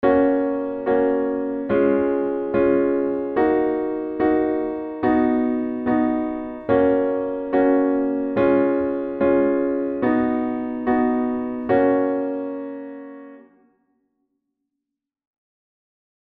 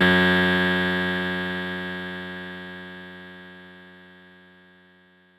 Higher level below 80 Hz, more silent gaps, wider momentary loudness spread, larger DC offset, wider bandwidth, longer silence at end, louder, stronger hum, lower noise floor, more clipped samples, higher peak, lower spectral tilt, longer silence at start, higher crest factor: first, -52 dBFS vs -58 dBFS; neither; second, 8 LU vs 24 LU; neither; second, 4.4 kHz vs 14.5 kHz; first, 3 s vs 1.35 s; about the same, -21 LUFS vs -23 LUFS; neither; first, -83 dBFS vs -57 dBFS; neither; about the same, -4 dBFS vs -6 dBFS; first, -10.5 dB/octave vs -6 dB/octave; about the same, 0 s vs 0 s; about the same, 16 dB vs 20 dB